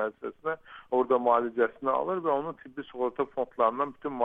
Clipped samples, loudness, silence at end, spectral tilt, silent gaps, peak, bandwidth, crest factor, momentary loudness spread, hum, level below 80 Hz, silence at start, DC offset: under 0.1%; -29 LUFS; 0 s; -8 dB/octave; none; -10 dBFS; 3.9 kHz; 18 dB; 11 LU; none; -70 dBFS; 0 s; under 0.1%